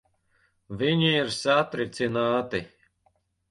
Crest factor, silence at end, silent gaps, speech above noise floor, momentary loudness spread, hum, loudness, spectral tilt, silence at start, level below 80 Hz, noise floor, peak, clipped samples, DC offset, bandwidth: 18 dB; 0.85 s; none; 44 dB; 10 LU; none; -25 LUFS; -5 dB/octave; 0.7 s; -60 dBFS; -69 dBFS; -8 dBFS; under 0.1%; under 0.1%; 11.5 kHz